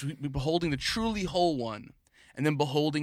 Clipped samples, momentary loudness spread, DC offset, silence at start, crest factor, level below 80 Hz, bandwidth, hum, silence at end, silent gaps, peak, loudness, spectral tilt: under 0.1%; 9 LU; under 0.1%; 0 s; 18 dB; -50 dBFS; 15.5 kHz; none; 0 s; none; -12 dBFS; -30 LUFS; -5.5 dB/octave